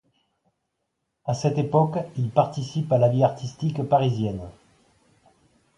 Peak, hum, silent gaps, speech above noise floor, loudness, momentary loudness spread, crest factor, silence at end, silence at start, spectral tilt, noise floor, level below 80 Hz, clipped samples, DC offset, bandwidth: -6 dBFS; none; none; 56 dB; -23 LUFS; 9 LU; 20 dB; 1.25 s; 1.25 s; -8 dB/octave; -78 dBFS; -56 dBFS; under 0.1%; under 0.1%; 10.5 kHz